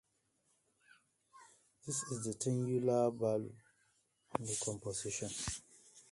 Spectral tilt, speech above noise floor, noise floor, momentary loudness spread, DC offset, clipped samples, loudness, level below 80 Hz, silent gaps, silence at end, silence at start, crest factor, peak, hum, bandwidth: -4.5 dB/octave; 41 dB; -79 dBFS; 12 LU; under 0.1%; under 0.1%; -38 LUFS; -66 dBFS; none; 0.1 s; 1.35 s; 24 dB; -16 dBFS; none; 11.5 kHz